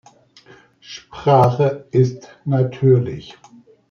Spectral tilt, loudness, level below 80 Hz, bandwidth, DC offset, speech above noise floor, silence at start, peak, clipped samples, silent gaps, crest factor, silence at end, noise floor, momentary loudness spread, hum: -8.5 dB/octave; -17 LUFS; -56 dBFS; 6.8 kHz; under 0.1%; 31 dB; 0.9 s; -2 dBFS; under 0.1%; none; 18 dB; 0.6 s; -48 dBFS; 20 LU; none